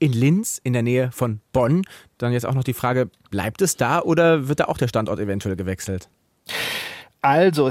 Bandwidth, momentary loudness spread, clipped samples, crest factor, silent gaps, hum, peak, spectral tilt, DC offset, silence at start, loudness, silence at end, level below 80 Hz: 16.5 kHz; 11 LU; under 0.1%; 16 dB; none; none; -4 dBFS; -5.5 dB/octave; under 0.1%; 0 s; -21 LUFS; 0 s; -52 dBFS